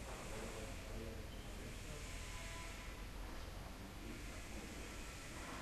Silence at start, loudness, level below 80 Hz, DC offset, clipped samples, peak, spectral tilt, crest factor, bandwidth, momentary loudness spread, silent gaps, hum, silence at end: 0 s; -51 LUFS; -52 dBFS; under 0.1%; under 0.1%; -36 dBFS; -4 dB/octave; 12 dB; 13 kHz; 3 LU; none; none; 0 s